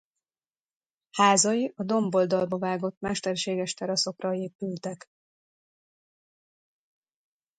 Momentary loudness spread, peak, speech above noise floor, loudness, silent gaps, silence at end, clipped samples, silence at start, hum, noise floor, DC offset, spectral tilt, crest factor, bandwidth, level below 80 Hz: 13 LU; -6 dBFS; over 63 dB; -26 LUFS; 2.97-3.01 s, 4.55-4.59 s; 2.6 s; under 0.1%; 1.15 s; none; under -90 dBFS; under 0.1%; -3.5 dB/octave; 24 dB; 9.6 kHz; -70 dBFS